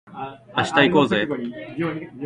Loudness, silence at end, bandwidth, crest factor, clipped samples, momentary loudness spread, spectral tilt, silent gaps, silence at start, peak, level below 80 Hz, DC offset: -21 LUFS; 0 s; 11 kHz; 22 dB; under 0.1%; 16 LU; -5.5 dB/octave; none; 0.05 s; 0 dBFS; -56 dBFS; under 0.1%